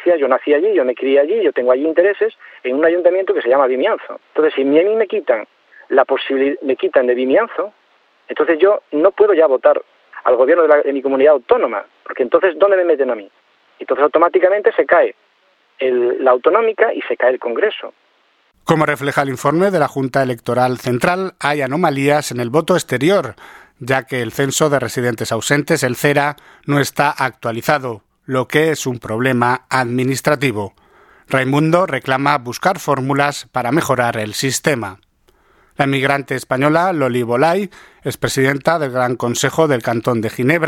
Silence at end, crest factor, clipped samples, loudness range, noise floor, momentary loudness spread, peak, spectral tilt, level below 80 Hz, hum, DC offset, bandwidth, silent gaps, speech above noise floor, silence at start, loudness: 0 s; 16 dB; under 0.1%; 3 LU; -58 dBFS; 8 LU; 0 dBFS; -5 dB/octave; -56 dBFS; none; under 0.1%; 18 kHz; none; 42 dB; 0 s; -16 LUFS